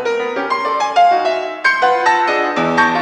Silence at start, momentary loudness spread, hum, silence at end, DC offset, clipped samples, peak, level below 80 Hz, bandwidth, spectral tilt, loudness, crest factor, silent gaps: 0 s; 6 LU; none; 0 s; under 0.1%; under 0.1%; -2 dBFS; -62 dBFS; 9.8 kHz; -3.5 dB/octave; -15 LUFS; 12 dB; none